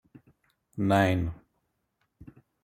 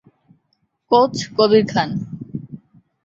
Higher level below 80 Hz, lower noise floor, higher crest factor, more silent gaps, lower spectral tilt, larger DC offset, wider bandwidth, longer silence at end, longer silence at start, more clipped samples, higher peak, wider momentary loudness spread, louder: about the same, -54 dBFS vs -56 dBFS; first, -77 dBFS vs -68 dBFS; about the same, 22 dB vs 18 dB; neither; first, -7 dB/octave vs -5.5 dB/octave; neither; first, 15.5 kHz vs 7.8 kHz; about the same, 0.4 s vs 0.5 s; second, 0.75 s vs 0.9 s; neither; second, -10 dBFS vs -2 dBFS; first, 21 LU vs 18 LU; second, -27 LUFS vs -17 LUFS